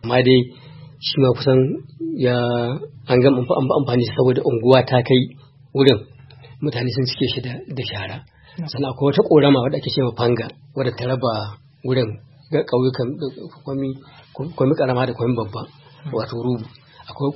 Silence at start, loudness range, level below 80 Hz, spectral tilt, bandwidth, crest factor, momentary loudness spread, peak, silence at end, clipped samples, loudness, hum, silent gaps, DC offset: 0 s; 6 LU; -54 dBFS; -9 dB/octave; 5.8 kHz; 20 dB; 16 LU; 0 dBFS; 0 s; under 0.1%; -19 LUFS; none; none; under 0.1%